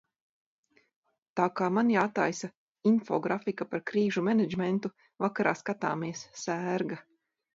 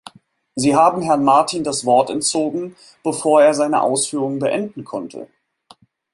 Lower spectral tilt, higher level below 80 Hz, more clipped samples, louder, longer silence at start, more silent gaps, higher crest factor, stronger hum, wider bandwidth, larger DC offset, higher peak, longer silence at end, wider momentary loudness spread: first, -6 dB/octave vs -4 dB/octave; second, -74 dBFS vs -62 dBFS; neither; second, -30 LUFS vs -17 LUFS; first, 1.35 s vs 0.55 s; first, 2.57-2.75 s vs none; about the same, 20 dB vs 16 dB; neither; second, 7.8 kHz vs 11.5 kHz; neither; second, -10 dBFS vs -2 dBFS; second, 0.55 s vs 0.9 s; second, 11 LU vs 15 LU